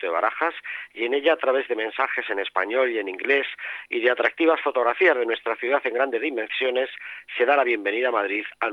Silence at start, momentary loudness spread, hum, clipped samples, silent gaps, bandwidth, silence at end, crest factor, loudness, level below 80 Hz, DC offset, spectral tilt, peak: 0 s; 8 LU; none; under 0.1%; none; 6 kHz; 0 s; 18 dB; -23 LUFS; -78 dBFS; under 0.1%; -4 dB/octave; -6 dBFS